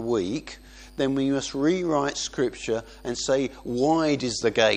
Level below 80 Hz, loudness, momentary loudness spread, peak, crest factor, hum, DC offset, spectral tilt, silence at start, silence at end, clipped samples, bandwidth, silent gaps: -50 dBFS; -26 LUFS; 10 LU; -6 dBFS; 20 dB; none; under 0.1%; -4.5 dB/octave; 0 s; 0 s; under 0.1%; 10.5 kHz; none